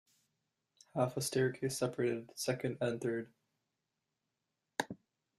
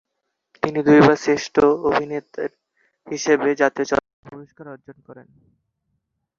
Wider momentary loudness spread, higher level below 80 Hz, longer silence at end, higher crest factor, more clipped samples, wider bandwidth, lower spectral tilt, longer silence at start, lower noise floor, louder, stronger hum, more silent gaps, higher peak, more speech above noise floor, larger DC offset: second, 10 LU vs 21 LU; second, -76 dBFS vs -54 dBFS; second, 0.45 s vs 1.25 s; about the same, 24 dB vs 20 dB; neither; first, 14 kHz vs 7.4 kHz; about the same, -5 dB/octave vs -5.5 dB/octave; first, 0.95 s vs 0.65 s; first, -88 dBFS vs -77 dBFS; second, -37 LUFS vs -19 LUFS; neither; second, none vs 4.13-4.23 s; second, -14 dBFS vs -2 dBFS; second, 52 dB vs 58 dB; neither